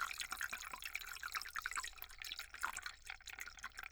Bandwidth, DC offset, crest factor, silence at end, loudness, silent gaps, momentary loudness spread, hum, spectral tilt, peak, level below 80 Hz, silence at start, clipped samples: over 20 kHz; under 0.1%; 22 dB; 0 s; -46 LUFS; none; 7 LU; none; 1 dB/octave; -24 dBFS; -66 dBFS; 0 s; under 0.1%